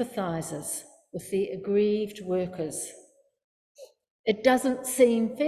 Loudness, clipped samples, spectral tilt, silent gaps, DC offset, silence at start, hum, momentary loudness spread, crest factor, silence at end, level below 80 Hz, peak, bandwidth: -27 LUFS; under 0.1%; -4.5 dB/octave; 3.44-3.75 s, 4.10-4.24 s; under 0.1%; 0 s; none; 13 LU; 20 dB; 0 s; -64 dBFS; -8 dBFS; 14.5 kHz